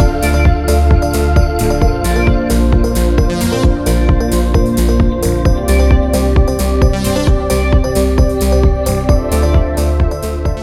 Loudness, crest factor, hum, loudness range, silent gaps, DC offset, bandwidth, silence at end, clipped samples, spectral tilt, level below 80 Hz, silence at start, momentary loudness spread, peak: -13 LUFS; 10 dB; none; 1 LU; none; under 0.1%; 15.5 kHz; 0 s; under 0.1%; -6.5 dB/octave; -14 dBFS; 0 s; 2 LU; 0 dBFS